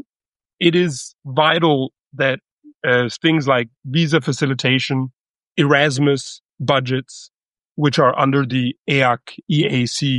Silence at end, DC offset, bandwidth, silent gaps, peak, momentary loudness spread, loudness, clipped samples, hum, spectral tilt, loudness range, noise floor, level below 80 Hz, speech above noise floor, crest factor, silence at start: 0 s; under 0.1%; 11.5 kHz; 1.14-1.19 s, 2.52-2.58 s, 5.18-5.22 s, 5.30-5.34 s, 5.47-5.51 s, 6.45-6.49 s, 7.71-7.75 s, 8.78-8.85 s; -2 dBFS; 11 LU; -18 LUFS; under 0.1%; none; -5.5 dB/octave; 1 LU; under -90 dBFS; -60 dBFS; over 73 dB; 16 dB; 0.6 s